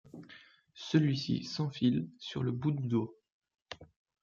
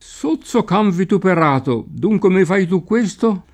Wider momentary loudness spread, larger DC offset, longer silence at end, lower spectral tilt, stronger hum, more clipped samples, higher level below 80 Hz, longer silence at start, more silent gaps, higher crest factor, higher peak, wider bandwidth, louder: first, 20 LU vs 6 LU; neither; first, 0.4 s vs 0.1 s; about the same, -7 dB/octave vs -7 dB/octave; neither; neither; second, -70 dBFS vs -50 dBFS; about the same, 0.15 s vs 0.1 s; first, 3.32-3.42 s vs none; first, 20 dB vs 14 dB; second, -14 dBFS vs -2 dBFS; second, 7.4 kHz vs 10 kHz; second, -33 LUFS vs -16 LUFS